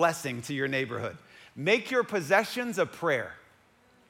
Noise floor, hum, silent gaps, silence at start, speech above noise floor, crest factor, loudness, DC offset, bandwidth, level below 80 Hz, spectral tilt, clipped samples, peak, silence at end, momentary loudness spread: -62 dBFS; none; none; 0 s; 34 dB; 20 dB; -29 LUFS; under 0.1%; 16.5 kHz; -72 dBFS; -4.5 dB/octave; under 0.1%; -10 dBFS; 0.7 s; 13 LU